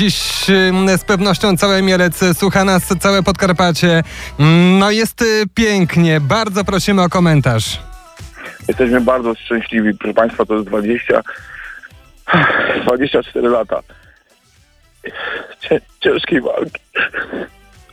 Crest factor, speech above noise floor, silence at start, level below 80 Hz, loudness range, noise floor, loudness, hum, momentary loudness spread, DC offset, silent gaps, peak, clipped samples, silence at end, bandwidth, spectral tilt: 14 dB; 38 dB; 0 s; -38 dBFS; 7 LU; -52 dBFS; -14 LUFS; none; 13 LU; under 0.1%; none; 0 dBFS; under 0.1%; 0.45 s; 16 kHz; -5 dB/octave